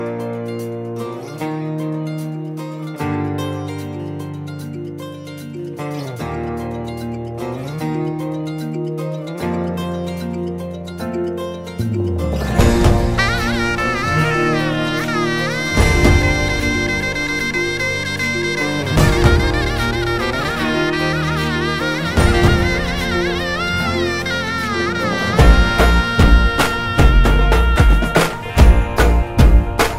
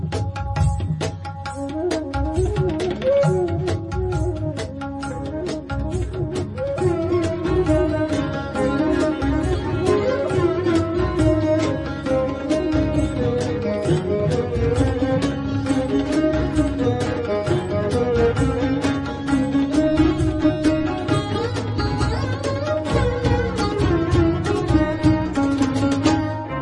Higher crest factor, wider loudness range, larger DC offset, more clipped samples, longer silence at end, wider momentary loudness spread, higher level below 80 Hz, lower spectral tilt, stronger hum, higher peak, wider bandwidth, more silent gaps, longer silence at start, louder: about the same, 16 dB vs 16 dB; first, 11 LU vs 3 LU; neither; neither; about the same, 0 s vs 0 s; first, 13 LU vs 7 LU; first, -20 dBFS vs -32 dBFS; second, -5.5 dB/octave vs -7 dB/octave; neither; first, 0 dBFS vs -4 dBFS; first, 16 kHz vs 11.5 kHz; neither; about the same, 0 s vs 0 s; first, -18 LUFS vs -21 LUFS